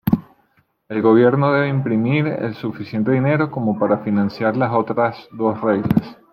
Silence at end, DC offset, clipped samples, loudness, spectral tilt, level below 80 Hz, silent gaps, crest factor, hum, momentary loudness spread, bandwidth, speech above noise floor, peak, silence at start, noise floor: 0.2 s; under 0.1%; under 0.1%; -19 LUFS; -10 dB/octave; -52 dBFS; none; 16 dB; none; 8 LU; 16 kHz; 43 dB; -2 dBFS; 0.05 s; -61 dBFS